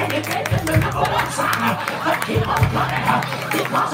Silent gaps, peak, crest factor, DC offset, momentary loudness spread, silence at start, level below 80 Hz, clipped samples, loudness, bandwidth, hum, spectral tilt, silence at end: none; -2 dBFS; 18 dB; under 0.1%; 3 LU; 0 s; -38 dBFS; under 0.1%; -20 LUFS; 16.5 kHz; none; -5 dB/octave; 0 s